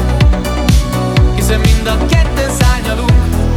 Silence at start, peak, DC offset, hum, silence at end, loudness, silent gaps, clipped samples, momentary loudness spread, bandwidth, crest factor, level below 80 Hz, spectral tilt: 0 s; 0 dBFS; under 0.1%; none; 0 s; -12 LUFS; none; under 0.1%; 2 LU; 15.5 kHz; 10 dB; -14 dBFS; -5.5 dB/octave